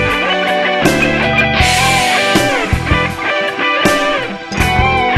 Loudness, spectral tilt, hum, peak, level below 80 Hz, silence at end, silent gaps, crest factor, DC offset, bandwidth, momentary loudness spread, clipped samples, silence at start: -12 LUFS; -4 dB/octave; none; 0 dBFS; -26 dBFS; 0 s; none; 12 dB; under 0.1%; 15.5 kHz; 5 LU; under 0.1%; 0 s